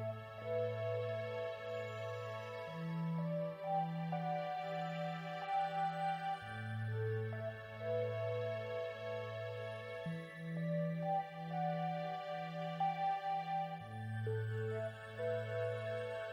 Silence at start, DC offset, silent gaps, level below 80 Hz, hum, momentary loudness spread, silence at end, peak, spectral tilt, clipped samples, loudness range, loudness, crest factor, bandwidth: 0 s; under 0.1%; none; -78 dBFS; none; 6 LU; 0 s; -28 dBFS; -7.5 dB/octave; under 0.1%; 2 LU; -41 LUFS; 14 dB; 11 kHz